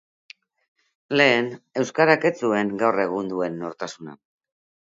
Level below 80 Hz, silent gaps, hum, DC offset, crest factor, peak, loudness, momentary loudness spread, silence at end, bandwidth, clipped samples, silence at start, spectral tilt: -70 dBFS; none; none; under 0.1%; 22 dB; 0 dBFS; -22 LUFS; 15 LU; 0.75 s; 7.8 kHz; under 0.1%; 1.1 s; -5 dB/octave